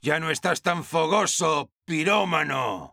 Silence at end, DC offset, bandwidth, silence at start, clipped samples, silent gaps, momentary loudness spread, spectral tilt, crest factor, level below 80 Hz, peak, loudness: 0.05 s; under 0.1%; 17.5 kHz; 0.05 s; under 0.1%; 1.72-1.76 s; 5 LU; -3.5 dB/octave; 18 dB; -66 dBFS; -6 dBFS; -24 LUFS